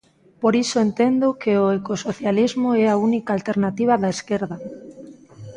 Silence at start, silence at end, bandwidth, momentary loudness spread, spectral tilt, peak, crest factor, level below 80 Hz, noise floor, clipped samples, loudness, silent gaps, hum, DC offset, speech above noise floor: 0.4 s; 0 s; 10.5 kHz; 9 LU; -6 dB/octave; -6 dBFS; 16 dB; -60 dBFS; -42 dBFS; under 0.1%; -20 LUFS; none; none; under 0.1%; 22 dB